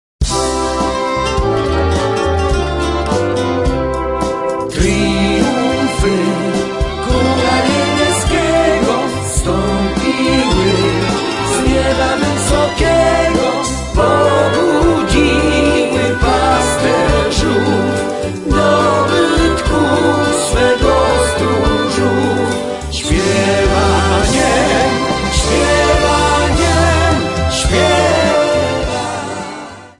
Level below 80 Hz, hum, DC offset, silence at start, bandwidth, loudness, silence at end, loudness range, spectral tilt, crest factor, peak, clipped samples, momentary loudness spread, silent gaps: -24 dBFS; none; under 0.1%; 0.2 s; 11.5 kHz; -13 LUFS; 0.1 s; 3 LU; -4.5 dB/octave; 12 dB; 0 dBFS; under 0.1%; 6 LU; none